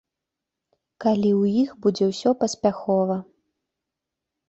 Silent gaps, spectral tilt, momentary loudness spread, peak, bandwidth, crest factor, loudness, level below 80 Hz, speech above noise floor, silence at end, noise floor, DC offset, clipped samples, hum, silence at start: none; -6.5 dB/octave; 5 LU; -6 dBFS; 8.2 kHz; 18 dB; -22 LUFS; -64 dBFS; 64 dB; 1.25 s; -85 dBFS; under 0.1%; under 0.1%; none; 1 s